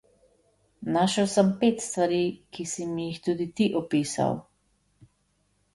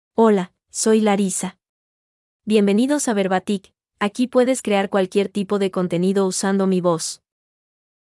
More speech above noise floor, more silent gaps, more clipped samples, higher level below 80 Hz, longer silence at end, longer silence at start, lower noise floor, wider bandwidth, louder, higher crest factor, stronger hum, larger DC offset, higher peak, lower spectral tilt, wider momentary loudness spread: second, 45 dB vs over 71 dB; second, none vs 1.69-2.40 s; neither; about the same, -64 dBFS vs -68 dBFS; first, 1.35 s vs 0.9 s; first, 0.8 s vs 0.2 s; second, -70 dBFS vs under -90 dBFS; about the same, 11.5 kHz vs 12 kHz; second, -26 LUFS vs -20 LUFS; about the same, 20 dB vs 16 dB; neither; neither; second, -8 dBFS vs -4 dBFS; about the same, -5 dB/octave vs -5 dB/octave; about the same, 10 LU vs 9 LU